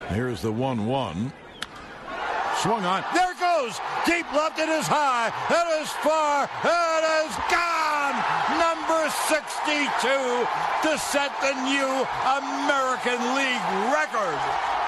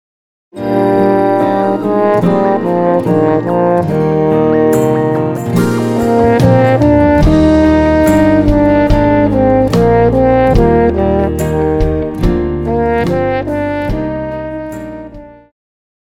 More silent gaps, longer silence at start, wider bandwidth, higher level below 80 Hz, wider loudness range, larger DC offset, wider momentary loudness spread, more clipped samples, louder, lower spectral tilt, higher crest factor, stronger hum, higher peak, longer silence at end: neither; second, 0 s vs 0.55 s; second, 12.5 kHz vs 16.5 kHz; second, -56 dBFS vs -24 dBFS; second, 3 LU vs 6 LU; neither; second, 5 LU vs 8 LU; neither; second, -24 LUFS vs -11 LUFS; second, -3.5 dB/octave vs -8 dB/octave; first, 16 dB vs 10 dB; neither; second, -8 dBFS vs 0 dBFS; second, 0 s vs 0.75 s